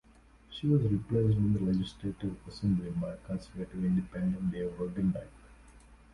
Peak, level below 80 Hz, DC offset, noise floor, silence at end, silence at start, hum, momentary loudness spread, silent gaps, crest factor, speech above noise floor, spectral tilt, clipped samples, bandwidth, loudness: -16 dBFS; -52 dBFS; under 0.1%; -59 dBFS; 0.2 s; 0.5 s; none; 12 LU; none; 16 dB; 28 dB; -9 dB/octave; under 0.1%; 11 kHz; -32 LUFS